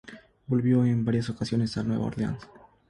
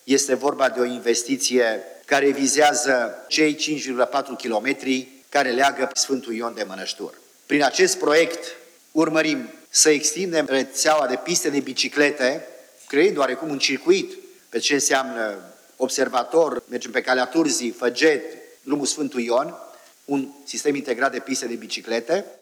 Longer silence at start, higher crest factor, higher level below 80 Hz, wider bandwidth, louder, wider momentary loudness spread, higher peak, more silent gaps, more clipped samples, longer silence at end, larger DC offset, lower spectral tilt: about the same, 0.05 s vs 0.05 s; about the same, 16 dB vs 20 dB; first, -54 dBFS vs -82 dBFS; second, 11 kHz vs over 20 kHz; second, -27 LUFS vs -21 LUFS; about the same, 10 LU vs 11 LU; second, -12 dBFS vs -2 dBFS; neither; neither; first, 0.45 s vs 0.05 s; neither; first, -8 dB/octave vs -2 dB/octave